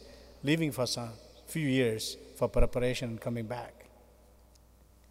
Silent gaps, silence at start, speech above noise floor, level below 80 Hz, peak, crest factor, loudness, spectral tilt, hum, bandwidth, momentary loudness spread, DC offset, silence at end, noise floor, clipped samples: none; 0 s; 29 dB; -40 dBFS; -12 dBFS; 20 dB; -33 LUFS; -5 dB/octave; none; 16 kHz; 13 LU; under 0.1%; 1.25 s; -60 dBFS; under 0.1%